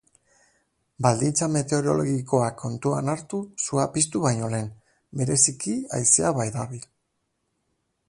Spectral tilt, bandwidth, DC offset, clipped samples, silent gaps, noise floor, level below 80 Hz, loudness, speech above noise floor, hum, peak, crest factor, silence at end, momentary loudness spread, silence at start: -4.5 dB/octave; 11.5 kHz; under 0.1%; under 0.1%; none; -75 dBFS; -58 dBFS; -23 LUFS; 51 dB; none; -4 dBFS; 22 dB; 1.25 s; 12 LU; 1 s